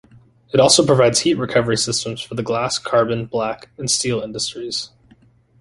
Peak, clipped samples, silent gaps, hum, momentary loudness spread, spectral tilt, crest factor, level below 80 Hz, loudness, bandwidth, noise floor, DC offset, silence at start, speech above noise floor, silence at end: 0 dBFS; under 0.1%; none; none; 13 LU; -3.5 dB/octave; 20 dB; -52 dBFS; -18 LUFS; 11.5 kHz; -52 dBFS; under 0.1%; 0.55 s; 34 dB; 0.75 s